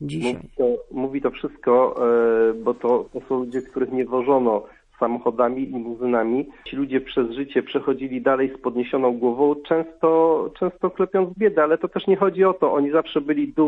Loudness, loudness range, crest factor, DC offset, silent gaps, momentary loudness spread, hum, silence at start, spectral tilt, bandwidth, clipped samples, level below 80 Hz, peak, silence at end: -22 LUFS; 3 LU; 16 dB; under 0.1%; none; 8 LU; none; 0 s; -7.5 dB/octave; 9.6 kHz; under 0.1%; -54 dBFS; -6 dBFS; 0 s